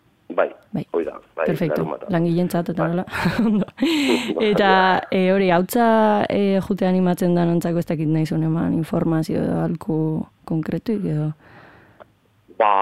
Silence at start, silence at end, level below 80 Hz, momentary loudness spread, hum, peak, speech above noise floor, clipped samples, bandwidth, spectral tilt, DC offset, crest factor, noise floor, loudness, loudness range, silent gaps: 0.3 s; 0 s; -52 dBFS; 9 LU; none; -2 dBFS; 34 dB; under 0.1%; 15.5 kHz; -7 dB/octave; 0.3%; 18 dB; -53 dBFS; -20 LUFS; 6 LU; none